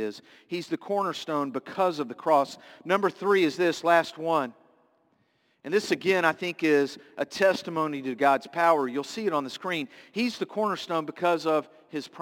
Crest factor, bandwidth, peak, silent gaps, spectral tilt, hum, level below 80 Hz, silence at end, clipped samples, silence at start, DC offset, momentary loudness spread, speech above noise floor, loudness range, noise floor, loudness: 20 dB; 17 kHz; -8 dBFS; none; -4.5 dB/octave; none; -78 dBFS; 0 s; under 0.1%; 0 s; under 0.1%; 12 LU; 42 dB; 3 LU; -69 dBFS; -27 LUFS